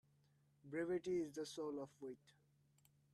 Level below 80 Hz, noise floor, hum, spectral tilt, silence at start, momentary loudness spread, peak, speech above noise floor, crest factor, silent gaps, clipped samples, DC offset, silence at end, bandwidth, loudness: -84 dBFS; -77 dBFS; none; -5.5 dB/octave; 0.65 s; 13 LU; -34 dBFS; 31 dB; 16 dB; none; under 0.1%; under 0.1%; 0.95 s; 13.5 kHz; -46 LUFS